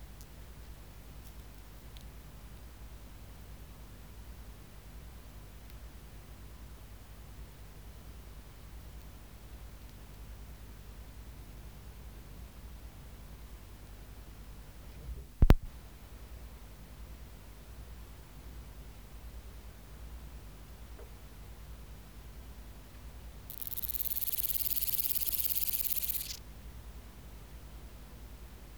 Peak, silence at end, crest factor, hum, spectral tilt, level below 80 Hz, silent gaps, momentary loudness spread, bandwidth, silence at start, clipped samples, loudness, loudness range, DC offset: -4 dBFS; 0 s; 36 dB; 50 Hz at -55 dBFS; -4 dB/octave; -42 dBFS; none; 22 LU; over 20 kHz; 0 s; under 0.1%; -31 LUFS; 20 LU; 0.1%